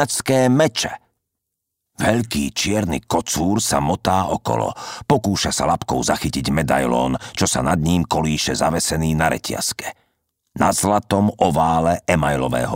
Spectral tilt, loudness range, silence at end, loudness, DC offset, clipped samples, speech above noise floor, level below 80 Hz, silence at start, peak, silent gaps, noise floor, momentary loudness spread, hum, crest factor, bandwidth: -4.5 dB/octave; 1 LU; 0 s; -19 LUFS; under 0.1%; under 0.1%; 60 dB; -40 dBFS; 0 s; -2 dBFS; none; -79 dBFS; 6 LU; none; 18 dB; 16.5 kHz